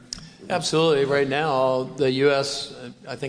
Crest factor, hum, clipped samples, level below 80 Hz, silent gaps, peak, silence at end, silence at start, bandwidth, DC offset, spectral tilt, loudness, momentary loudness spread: 16 dB; none; under 0.1%; -56 dBFS; none; -6 dBFS; 0 s; 0.1 s; 11 kHz; under 0.1%; -4.5 dB/octave; -22 LUFS; 17 LU